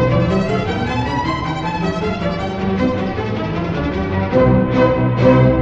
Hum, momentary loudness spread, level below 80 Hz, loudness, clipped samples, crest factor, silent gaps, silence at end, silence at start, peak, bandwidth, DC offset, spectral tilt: none; 8 LU; -32 dBFS; -17 LUFS; under 0.1%; 16 dB; none; 0 s; 0 s; 0 dBFS; 7.6 kHz; under 0.1%; -8 dB/octave